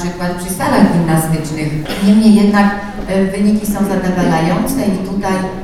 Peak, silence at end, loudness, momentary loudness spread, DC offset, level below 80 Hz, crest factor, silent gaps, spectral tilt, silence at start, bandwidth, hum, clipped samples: 0 dBFS; 0 s; -14 LUFS; 10 LU; under 0.1%; -32 dBFS; 12 dB; none; -6 dB/octave; 0 s; 15.5 kHz; none; under 0.1%